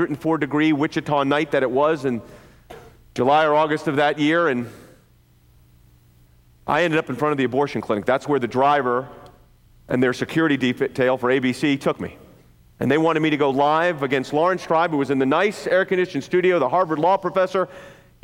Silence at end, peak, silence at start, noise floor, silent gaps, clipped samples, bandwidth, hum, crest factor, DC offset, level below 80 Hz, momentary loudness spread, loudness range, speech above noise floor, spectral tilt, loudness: 0.3 s; -6 dBFS; 0 s; -55 dBFS; none; under 0.1%; 16.5 kHz; none; 14 dB; under 0.1%; -58 dBFS; 6 LU; 4 LU; 35 dB; -6 dB/octave; -20 LUFS